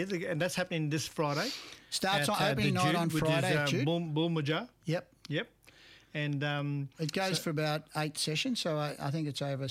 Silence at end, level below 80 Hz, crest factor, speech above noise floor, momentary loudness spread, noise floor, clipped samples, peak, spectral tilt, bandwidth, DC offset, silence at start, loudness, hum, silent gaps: 0 s; -64 dBFS; 14 dB; 26 dB; 8 LU; -58 dBFS; under 0.1%; -20 dBFS; -5 dB/octave; 16 kHz; under 0.1%; 0 s; -32 LUFS; none; none